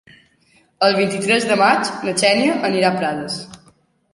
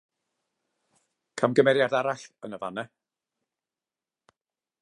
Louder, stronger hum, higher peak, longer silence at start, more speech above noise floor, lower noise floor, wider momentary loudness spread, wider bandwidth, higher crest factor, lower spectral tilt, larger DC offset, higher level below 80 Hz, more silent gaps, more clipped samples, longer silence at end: first, -17 LUFS vs -25 LUFS; neither; first, 0 dBFS vs -6 dBFS; second, 0.8 s vs 1.35 s; second, 40 dB vs over 65 dB; second, -57 dBFS vs under -90 dBFS; second, 11 LU vs 20 LU; about the same, 11.5 kHz vs 11 kHz; second, 18 dB vs 24 dB; second, -3.5 dB/octave vs -5.5 dB/octave; neither; first, -62 dBFS vs -80 dBFS; neither; neither; second, 0.6 s vs 1.95 s